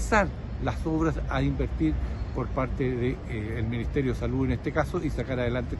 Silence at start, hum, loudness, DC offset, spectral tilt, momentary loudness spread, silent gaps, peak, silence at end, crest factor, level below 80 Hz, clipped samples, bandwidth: 0 s; none; -29 LUFS; under 0.1%; -7 dB/octave; 5 LU; none; -8 dBFS; 0 s; 20 dB; -34 dBFS; under 0.1%; 12 kHz